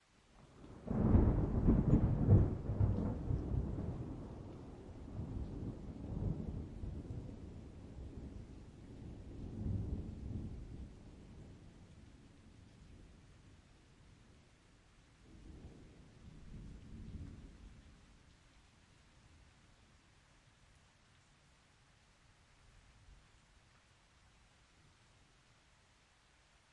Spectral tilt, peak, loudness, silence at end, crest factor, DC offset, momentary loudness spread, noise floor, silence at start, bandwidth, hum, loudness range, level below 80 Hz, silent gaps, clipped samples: -9.5 dB/octave; -16 dBFS; -39 LUFS; 3.55 s; 24 dB; under 0.1%; 29 LU; -69 dBFS; 0.4 s; 9 kHz; none; 27 LU; -48 dBFS; none; under 0.1%